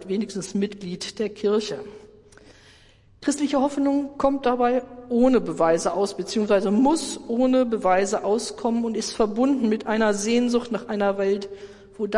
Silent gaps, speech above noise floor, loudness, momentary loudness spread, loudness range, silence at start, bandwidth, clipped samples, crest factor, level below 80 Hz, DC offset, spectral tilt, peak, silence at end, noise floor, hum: none; 31 dB; -23 LUFS; 9 LU; 5 LU; 0 s; 11.5 kHz; under 0.1%; 16 dB; -54 dBFS; under 0.1%; -5 dB/octave; -8 dBFS; 0 s; -54 dBFS; none